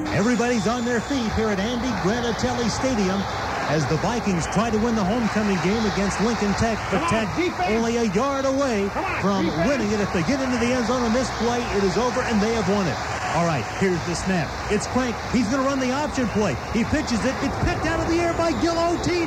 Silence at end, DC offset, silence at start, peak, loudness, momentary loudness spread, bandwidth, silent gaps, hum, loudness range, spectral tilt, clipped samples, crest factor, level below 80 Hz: 0 s; under 0.1%; 0 s; -8 dBFS; -22 LUFS; 3 LU; 14.5 kHz; none; none; 1 LU; -5 dB/octave; under 0.1%; 14 dB; -38 dBFS